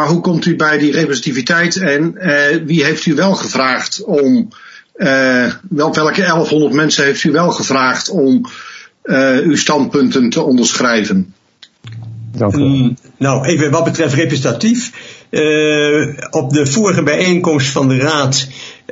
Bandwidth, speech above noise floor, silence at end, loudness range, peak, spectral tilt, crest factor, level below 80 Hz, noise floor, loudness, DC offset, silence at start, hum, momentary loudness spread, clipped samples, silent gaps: 8 kHz; 25 dB; 0.15 s; 2 LU; 0 dBFS; -4.5 dB/octave; 12 dB; -54 dBFS; -38 dBFS; -13 LUFS; under 0.1%; 0 s; none; 7 LU; under 0.1%; none